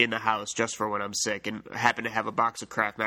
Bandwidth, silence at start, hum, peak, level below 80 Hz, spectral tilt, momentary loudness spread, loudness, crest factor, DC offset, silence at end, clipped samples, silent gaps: 17.5 kHz; 0 s; none; -4 dBFS; -68 dBFS; -2.5 dB/octave; 4 LU; -28 LUFS; 24 dB; under 0.1%; 0 s; under 0.1%; none